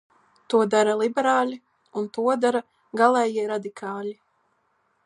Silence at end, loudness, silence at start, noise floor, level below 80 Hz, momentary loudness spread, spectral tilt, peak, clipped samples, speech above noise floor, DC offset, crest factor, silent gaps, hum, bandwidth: 0.9 s; -23 LUFS; 0.5 s; -69 dBFS; -80 dBFS; 14 LU; -4.5 dB/octave; -4 dBFS; under 0.1%; 47 dB; under 0.1%; 20 dB; none; none; 11.5 kHz